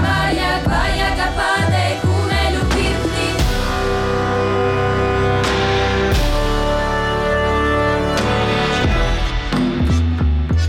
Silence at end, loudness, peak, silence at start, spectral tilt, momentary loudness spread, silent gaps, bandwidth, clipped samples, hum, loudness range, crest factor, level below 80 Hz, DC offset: 0 s; -17 LUFS; -8 dBFS; 0 s; -5.5 dB/octave; 2 LU; none; 16 kHz; under 0.1%; none; 1 LU; 8 dB; -22 dBFS; under 0.1%